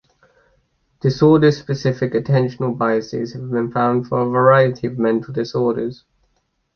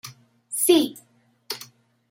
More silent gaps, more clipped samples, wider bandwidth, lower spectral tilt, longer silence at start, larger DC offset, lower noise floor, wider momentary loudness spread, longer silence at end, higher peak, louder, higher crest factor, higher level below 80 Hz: neither; neither; second, 6.8 kHz vs 16 kHz; first, -8 dB/octave vs -2 dB/octave; first, 1.05 s vs 0.05 s; neither; first, -67 dBFS vs -49 dBFS; second, 10 LU vs 22 LU; first, 0.8 s vs 0.45 s; first, -2 dBFS vs -6 dBFS; first, -18 LUFS vs -23 LUFS; about the same, 16 dB vs 20 dB; first, -54 dBFS vs -76 dBFS